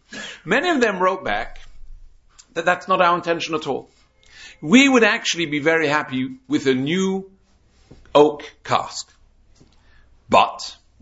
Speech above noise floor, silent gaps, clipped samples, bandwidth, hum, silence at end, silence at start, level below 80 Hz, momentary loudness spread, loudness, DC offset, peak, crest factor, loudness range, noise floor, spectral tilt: 37 dB; none; under 0.1%; 8 kHz; none; 0.3 s; 0.1 s; -48 dBFS; 17 LU; -19 LUFS; under 0.1%; 0 dBFS; 20 dB; 5 LU; -56 dBFS; -4 dB/octave